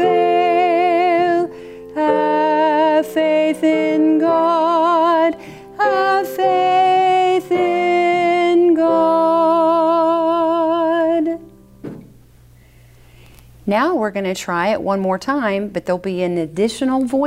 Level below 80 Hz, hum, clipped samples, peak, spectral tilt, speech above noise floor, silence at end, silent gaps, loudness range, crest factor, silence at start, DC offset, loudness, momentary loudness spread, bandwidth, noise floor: -54 dBFS; none; under 0.1%; -4 dBFS; -5.5 dB/octave; 28 dB; 0 s; none; 7 LU; 12 dB; 0 s; under 0.1%; -16 LUFS; 8 LU; 15.5 kHz; -46 dBFS